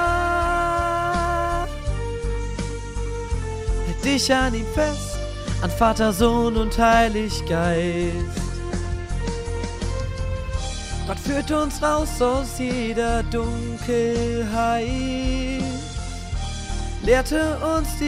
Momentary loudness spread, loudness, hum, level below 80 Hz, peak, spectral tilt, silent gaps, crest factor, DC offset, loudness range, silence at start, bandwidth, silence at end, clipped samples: 10 LU; -23 LUFS; none; -30 dBFS; -4 dBFS; -5 dB/octave; none; 18 dB; under 0.1%; 6 LU; 0 s; 15.5 kHz; 0 s; under 0.1%